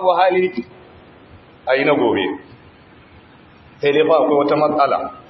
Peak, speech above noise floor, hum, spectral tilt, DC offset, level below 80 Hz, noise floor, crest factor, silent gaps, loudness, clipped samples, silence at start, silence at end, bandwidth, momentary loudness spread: -2 dBFS; 29 dB; none; -8 dB/octave; under 0.1%; -58 dBFS; -45 dBFS; 16 dB; none; -16 LUFS; under 0.1%; 0 s; 0.1 s; 6 kHz; 15 LU